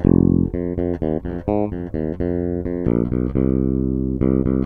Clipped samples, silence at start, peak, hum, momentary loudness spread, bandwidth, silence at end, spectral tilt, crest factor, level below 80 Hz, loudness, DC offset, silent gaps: under 0.1%; 0 s; 0 dBFS; none; 6 LU; 3.4 kHz; 0 s; -13 dB/octave; 20 dB; -30 dBFS; -21 LUFS; under 0.1%; none